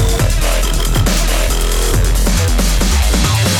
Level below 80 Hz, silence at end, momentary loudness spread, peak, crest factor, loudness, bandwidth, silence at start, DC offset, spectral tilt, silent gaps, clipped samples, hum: -14 dBFS; 0 s; 2 LU; 0 dBFS; 12 dB; -14 LUFS; 18.5 kHz; 0 s; under 0.1%; -4 dB/octave; none; under 0.1%; none